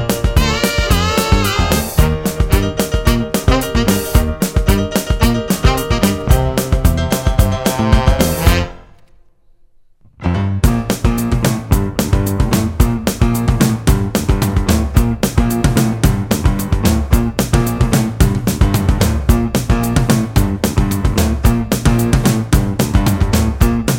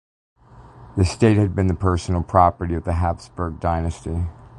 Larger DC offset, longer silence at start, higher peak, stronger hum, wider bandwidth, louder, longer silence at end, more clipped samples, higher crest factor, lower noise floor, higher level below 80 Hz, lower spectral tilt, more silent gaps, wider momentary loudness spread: neither; second, 0 s vs 0.55 s; about the same, 0 dBFS vs -2 dBFS; neither; first, 17 kHz vs 11 kHz; first, -15 LUFS vs -21 LUFS; about the same, 0 s vs 0 s; neither; second, 14 dB vs 20 dB; about the same, -47 dBFS vs -45 dBFS; first, -18 dBFS vs -30 dBFS; second, -5.5 dB/octave vs -7.5 dB/octave; neither; second, 3 LU vs 11 LU